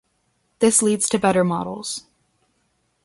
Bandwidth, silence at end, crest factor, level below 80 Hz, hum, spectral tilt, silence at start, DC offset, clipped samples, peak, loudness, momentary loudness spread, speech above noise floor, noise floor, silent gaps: 12 kHz; 1.05 s; 18 dB; -58 dBFS; none; -4 dB/octave; 0.6 s; under 0.1%; under 0.1%; -4 dBFS; -19 LUFS; 13 LU; 49 dB; -68 dBFS; none